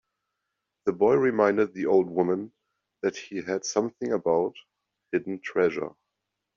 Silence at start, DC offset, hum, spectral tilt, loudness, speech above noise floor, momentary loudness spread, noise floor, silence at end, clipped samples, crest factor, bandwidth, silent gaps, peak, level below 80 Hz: 0.85 s; under 0.1%; none; -5 dB/octave; -26 LUFS; 58 dB; 10 LU; -83 dBFS; 0.65 s; under 0.1%; 20 dB; 7.4 kHz; none; -8 dBFS; -70 dBFS